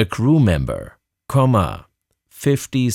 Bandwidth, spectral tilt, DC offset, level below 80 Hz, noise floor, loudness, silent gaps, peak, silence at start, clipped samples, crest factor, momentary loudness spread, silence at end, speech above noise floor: 15.5 kHz; -7 dB/octave; under 0.1%; -38 dBFS; -57 dBFS; -18 LUFS; none; -4 dBFS; 0 s; under 0.1%; 14 dB; 11 LU; 0 s; 40 dB